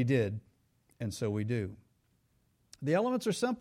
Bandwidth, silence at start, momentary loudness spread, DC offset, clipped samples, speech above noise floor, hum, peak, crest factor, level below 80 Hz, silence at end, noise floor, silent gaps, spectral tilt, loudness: 15.5 kHz; 0 s; 11 LU; under 0.1%; under 0.1%; 41 dB; none; -18 dBFS; 16 dB; -66 dBFS; 0 s; -72 dBFS; none; -6.5 dB/octave; -33 LUFS